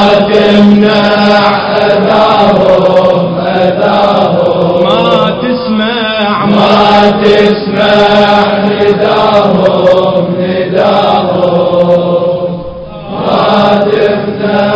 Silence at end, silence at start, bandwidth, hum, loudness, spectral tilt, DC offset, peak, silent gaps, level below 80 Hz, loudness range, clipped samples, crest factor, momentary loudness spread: 0 s; 0 s; 8 kHz; none; -7 LUFS; -7 dB/octave; under 0.1%; 0 dBFS; none; -38 dBFS; 3 LU; 4%; 8 dB; 6 LU